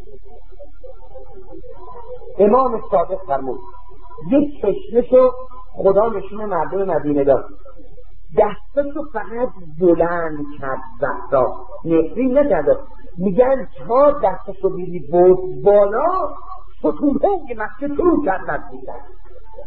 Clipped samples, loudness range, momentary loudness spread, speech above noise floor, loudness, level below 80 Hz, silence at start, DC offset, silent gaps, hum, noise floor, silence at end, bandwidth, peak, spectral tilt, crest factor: under 0.1%; 4 LU; 19 LU; 25 dB; -18 LUFS; -40 dBFS; 0.1 s; 6%; none; none; -42 dBFS; 0 s; 4.3 kHz; -2 dBFS; -11.5 dB/octave; 18 dB